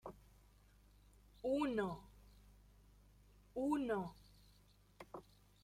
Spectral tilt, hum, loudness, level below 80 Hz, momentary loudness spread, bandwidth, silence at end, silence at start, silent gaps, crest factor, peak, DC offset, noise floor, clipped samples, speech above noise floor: -6.5 dB/octave; 50 Hz at -65 dBFS; -42 LUFS; -66 dBFS; 25 LU; 15.5 kHz; 0.4 s; 0.05 s; none; 20 dB; -26 dBFS; under 0.1%; -69 dBFS; under 0.1%; 29 dB